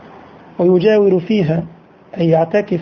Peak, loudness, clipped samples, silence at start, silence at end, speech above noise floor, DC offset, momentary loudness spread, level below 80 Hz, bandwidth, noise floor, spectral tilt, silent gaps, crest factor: -2 dBFS; -14 LUFS; under 0.1%; 0.6 s; 0 s; 26 dB; under 0.1%; 20 LU; -52 dBFS; 6.6 kHz; -39 dBFS; -9 dB/octave; none; 14 dB